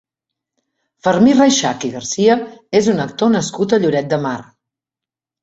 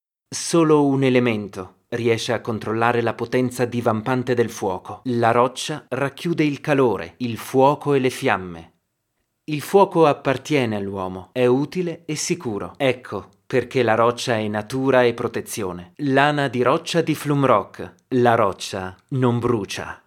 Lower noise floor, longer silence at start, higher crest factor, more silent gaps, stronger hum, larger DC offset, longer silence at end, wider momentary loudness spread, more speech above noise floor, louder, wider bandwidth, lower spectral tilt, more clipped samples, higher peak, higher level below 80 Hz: first, -88 dBFS vs -74 dBFS; first, 1.05 s vs 0.3 s; about the same, 16 dB vs 20 dB; neither; neither; neither; first, 1 s vs 0.1 s; about the same, 10 LU vs 11 LU; first, 73 dB vs 53 dB; first, -15 LUFS vs -21 LUFS; second, 8 kHz vs 16.5 kHz; about the same, -4.5 dB/octave vs -5.5 dB/octave; neither; about the same, -2 dBFS vs 0 dBFS; first, -56 dBFS vs -62 dBFS